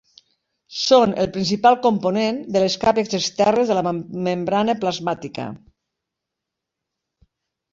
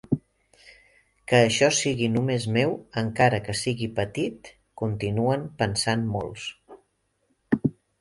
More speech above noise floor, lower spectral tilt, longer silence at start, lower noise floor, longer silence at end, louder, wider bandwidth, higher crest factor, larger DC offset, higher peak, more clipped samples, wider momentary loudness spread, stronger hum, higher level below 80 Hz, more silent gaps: first, 64 dB vs 47 dB; about the same, -5 dB/octave vs -4.5 dB/octave; first, 0.7 s vs 0.1 s; first, -83 dBFS vs -71 dBFS; first, 2.15 s vs 0.3 s; first, -19 LUFS vs -25 LUFS; second, 7.8 kHz vs 11.5 kHz; about the same, 20 dB vs 22 dB; neither; about the same, -2 dBFS vs -4 dBFS; neither; about the same, 11 LU vs 10 LU; neither; about the same, -56 dBFS vs -54 dBFS; neither